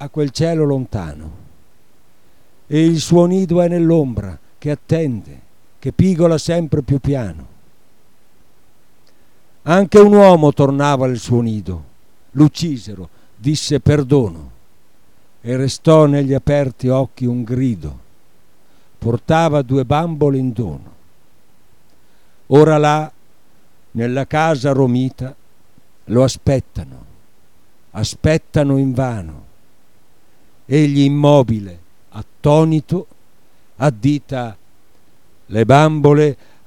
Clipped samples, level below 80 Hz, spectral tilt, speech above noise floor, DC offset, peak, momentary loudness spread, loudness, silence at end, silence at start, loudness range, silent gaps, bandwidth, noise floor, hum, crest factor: under 0.1%; -40 dBFS; -7 dB/octave; 43 dB; 1%; 0 dBFS; 18 LU; -15 LUFS; 0.35 s; 0 s; 7 LU; none; 12.5 kHz; -57 dBFS; none; 16 dB